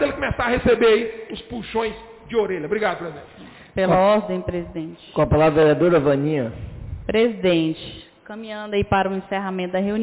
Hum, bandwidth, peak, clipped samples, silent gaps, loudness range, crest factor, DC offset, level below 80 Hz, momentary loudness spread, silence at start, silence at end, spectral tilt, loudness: none; 4 kHz; -8 dBFS; under 0.1%; none; 4 LU; 12 dB; under 0.1%; -40 dBFS; 17 LU; 0 s; 0 s; -10.5 dB/octave; -20 LUFS